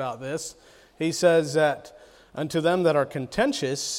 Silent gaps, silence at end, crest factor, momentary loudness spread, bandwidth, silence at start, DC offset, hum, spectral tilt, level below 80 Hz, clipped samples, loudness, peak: none; 0 s; 18 dB; 13 LU; 16 kHz; 0 s; under 0.1%; none; -4.5 dB/octave; -58 dBFS; under 0.1%; -24 LUFS; -8 dBFS